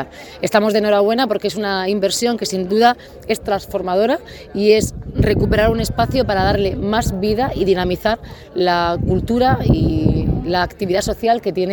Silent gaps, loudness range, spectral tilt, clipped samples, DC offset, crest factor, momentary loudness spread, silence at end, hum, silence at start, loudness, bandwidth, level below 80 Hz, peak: none; 1 LU; -5.5 dB/octave; under 0.1%; under 0.1%; 16 dB; 6 LU; 0 s; none; 0 s; -17 LUFS; 19 kHz; -30 dBFS; 0 dBFS